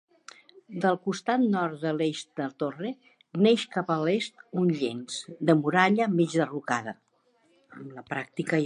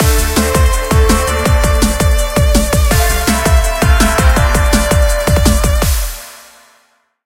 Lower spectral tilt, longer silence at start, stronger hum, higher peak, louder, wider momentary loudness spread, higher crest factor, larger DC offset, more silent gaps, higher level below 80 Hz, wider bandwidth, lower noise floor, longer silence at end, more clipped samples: first, -6 dB/octave vs -4.5 dB/octave; first, 0.7 s vs 0 s; neither; second, -6 dBFS vs 0 dBFS; second, -27 LUFS vs -12 LUFS; first, 15 LU vs 2 LU; first, 22 dB vs 12 dB; neither; neither; second, -78 dBFS vs -14 dBFS; second, 11 kHz vs 17 kHz; first, -67 dBFS vs -55 dBFS; second, 0 s vs 0.9 s; neither